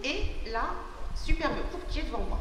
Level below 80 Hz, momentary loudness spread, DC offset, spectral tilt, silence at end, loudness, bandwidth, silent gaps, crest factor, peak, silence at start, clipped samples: -34 dBFS; 9 LU; under 0.1%; -5 dB/octave; 0 s; -34 LUFS; 10 kHz; none; 18 dB; -12 dBFS; 0 s; under 0.1%